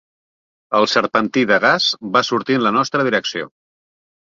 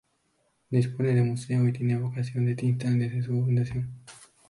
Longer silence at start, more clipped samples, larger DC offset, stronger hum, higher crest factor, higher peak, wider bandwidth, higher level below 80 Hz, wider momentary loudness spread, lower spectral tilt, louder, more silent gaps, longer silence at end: about the same, 0.7 s vs 0.7 s; neither; neither; neither; about the same, 18 dB vs 16 dB; first, -2 dBFS vs -12 dBFS; second, 7.6 kHz vs 11.5 kHz; about the same, -62 dBFS vs -58 dBFS; about the same, 7 LU vs 6 LU; second, -4 dB/octave vs -8.5 dB/octave; first, -16 LUFS vs -27 LUFS; neither; first, 0.85 s vs 0.25 s